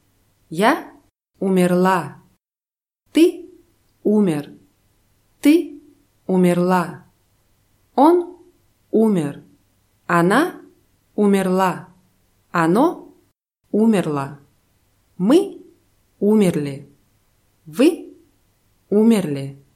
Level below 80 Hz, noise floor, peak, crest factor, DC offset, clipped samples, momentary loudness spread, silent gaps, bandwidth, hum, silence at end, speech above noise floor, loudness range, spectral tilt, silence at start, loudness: -64 dBFS; under -90 dBFS; -2 dBFS; 18 dB; under 0.1%; under 0.1%; 17 LU; none; 15.5 kHz; none; 0.2 s; over 74 dB; 2 LU; -6.5 dB/octave; 0.5 s; -18 LUFS